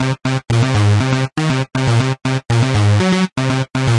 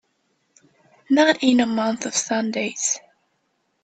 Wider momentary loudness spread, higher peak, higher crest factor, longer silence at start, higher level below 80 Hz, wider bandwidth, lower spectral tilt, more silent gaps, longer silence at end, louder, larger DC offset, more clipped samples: second, 4 LU vs 7 LU; about the same, -2 dBFS vs -4 dBFS; second, 14 dB vs 20 dB; second, 0 s vs 1.1 s; first, -40 dBFS vs -70 dBFS; first, 11.5 kHz vs 9.2 kHz; first, -6 dB/octave vs -2.5 dB/octave; neither; second, 0 s vs 0.85 s; first, -16 LUFS vs -20 LUFS; neither; neither